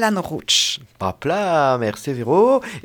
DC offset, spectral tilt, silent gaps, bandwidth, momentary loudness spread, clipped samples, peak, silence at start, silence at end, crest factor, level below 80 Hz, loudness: under 0.1%; -3.5 dB/octave; none; over 20 kHz; 10 LU; under 0.1%; -4 dBFS; 0 s; 0.05 s; 14 dB; -56 dBFS; -19 LUFS